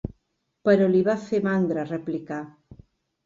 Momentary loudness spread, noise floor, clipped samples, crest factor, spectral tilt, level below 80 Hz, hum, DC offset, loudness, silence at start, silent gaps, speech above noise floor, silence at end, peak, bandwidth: 16 LU; -74 dBFS; under 0.1%; 18 dB; -8 dB/octave; -54 dBFS; none; under 0.1%; -24 LUFS; 0.05 s; none; 52 dB; 0.75 s; -8 dBFS; 7.6 kHz